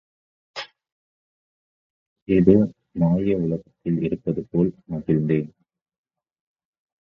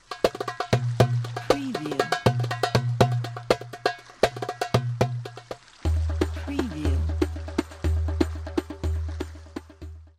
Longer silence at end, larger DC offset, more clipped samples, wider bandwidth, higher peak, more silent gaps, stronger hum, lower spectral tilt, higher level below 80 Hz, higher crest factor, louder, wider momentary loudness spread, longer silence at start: first, 1.5 s vs 0.1 s; neither; neither; second, 7 kHz vs 15.5 kHz; first, 0 dBFS vs -6 dBFS; first, 0.92-2.16 s, 2.22-2.26 s vs none; neither; first, -9.5 dB/octave vs -6 dB/octave; second, -50 dBFS vs -34 dBFS; about the same, 24 dB vs 20 dB; first, -22 LUFS vs -27 LUFS; first, 19 LU vs 12 LU; first, 0.55 s vs 0.1 s